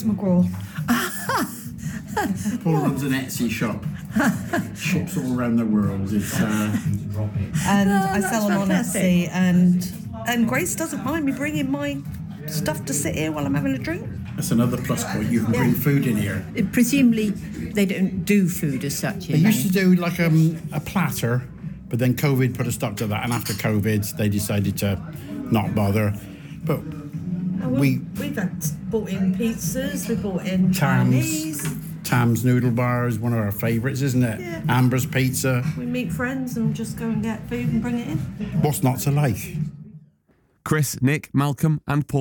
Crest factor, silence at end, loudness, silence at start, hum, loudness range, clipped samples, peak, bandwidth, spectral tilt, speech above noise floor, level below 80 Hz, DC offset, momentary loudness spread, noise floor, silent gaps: 16 dB; 0 s; -22 LUFS; 0 s; none; 4 LU; under 0.1%; -6 dBFS; 18 kHz; -6 dB/octave; 41 dB; -48 dBFS; under 0.1%; 9 LU; -62 dBFS; none